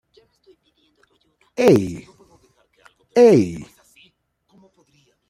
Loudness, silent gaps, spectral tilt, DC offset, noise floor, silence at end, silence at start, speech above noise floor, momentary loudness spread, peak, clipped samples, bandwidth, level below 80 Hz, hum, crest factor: -16 LUFS; none; -7 dB/octave; under 0.1%; -63 dBFS; 1.65 s; 1.6 s; 48 dB; 23 LU; -2 dBFS; under 0.1%; 15.5 kHz; -58 dBFS; none; 20 dB